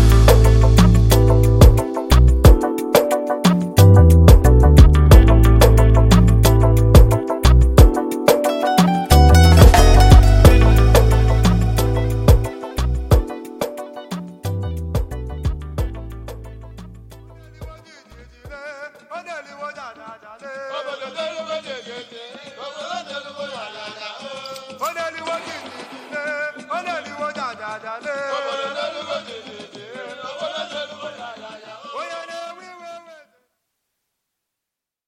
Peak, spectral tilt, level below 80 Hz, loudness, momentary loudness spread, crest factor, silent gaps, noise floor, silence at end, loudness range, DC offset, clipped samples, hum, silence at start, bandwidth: 0 dBFS; -6.5 dB/octave; -18 dBFS; -14 LUFS; 23 LU; 14 dB; none; -85 dBFS; 2.1 s; 22 LU; under 0.1%; under 0.1%; none; 0 s; 16.5 kHz